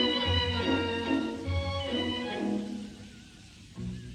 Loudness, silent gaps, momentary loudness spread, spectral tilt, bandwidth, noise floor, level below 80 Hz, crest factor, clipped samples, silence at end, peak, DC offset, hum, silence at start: -31 LUFS; none; 21 LU; -5.5 dB/octave; 11 kHz; -51 dBFS; -46 dBFS; 16 dB; under 0.1%; 0 s; -16 dBFS; under 0.1%; none; 0 s